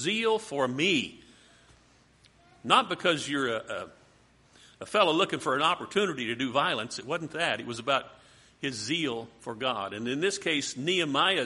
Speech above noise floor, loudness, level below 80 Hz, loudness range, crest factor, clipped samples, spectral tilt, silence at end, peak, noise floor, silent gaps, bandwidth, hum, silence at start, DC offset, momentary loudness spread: 32 dB; -28 LUFS; -68 dBFS; 3 LU; 24 dB; under 0.1%; -3.5 dB/octave; 0 s; -6 dBFS; -61 dBFS; none; 11.5 kHz; none; 0 s; under 0.1%; 12 LU